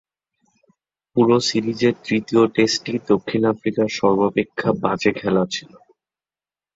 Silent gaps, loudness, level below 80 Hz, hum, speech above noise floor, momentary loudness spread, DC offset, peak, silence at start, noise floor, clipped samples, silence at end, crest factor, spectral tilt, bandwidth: none; -20 LUFS; -58 dBFS; none; over 71 dB; 6 LU; under 0.1%; -2 dBFS; 1.15 s; under -90 dBFS; under 0.1%; 1.1 s; 18 dB; -5 dB/octave; 7.8 kHz